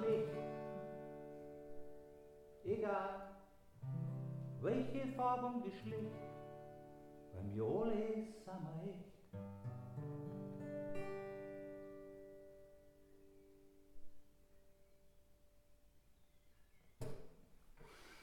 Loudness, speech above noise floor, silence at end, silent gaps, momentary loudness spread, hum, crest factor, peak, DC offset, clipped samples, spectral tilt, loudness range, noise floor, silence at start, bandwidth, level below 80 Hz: -46 LUFS; 27 dB; 0 s; none; 20 LU; none; 20 dB; -26 dBFS; under 0.1%; under 0.1%; -8 dB/octave; 18 LU; -69 dBFS; 0 s; 17 kHz; -68 dBFS